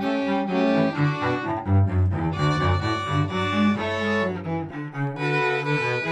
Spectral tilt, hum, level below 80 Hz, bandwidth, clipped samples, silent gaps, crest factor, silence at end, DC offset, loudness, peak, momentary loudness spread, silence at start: -7 dB/octave; none; -52 dBFS; 9.4 kHz; under 0.1%; none; 14 dB; 0 s; under 0.1%; -23 LUFS; -10 dBFS; 6 LU; 0 s